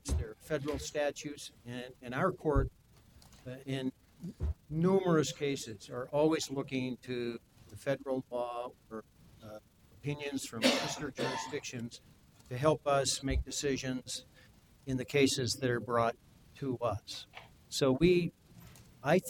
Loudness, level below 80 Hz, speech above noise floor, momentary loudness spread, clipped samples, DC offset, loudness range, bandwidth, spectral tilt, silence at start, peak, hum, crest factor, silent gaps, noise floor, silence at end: -34 LUFS; -48 dBFS; 27 dB; 19 LU; under 0.1%; under 0.1%; 5 LU; 19 kHz; -5 dB/octave; 0.05 s; -14 dBFS; none; 22 dB; none; -61 dBFS; 0 s